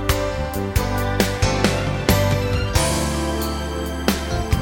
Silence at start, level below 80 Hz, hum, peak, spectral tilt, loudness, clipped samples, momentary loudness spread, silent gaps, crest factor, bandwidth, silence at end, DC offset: 0 s; -28 dBFS; none; 0 dBFS; -5 dB/octave; -21 LUFS; under 0.1%; 6 LU; none; 20 dB; 17 kHz; 0 s; under 0.1%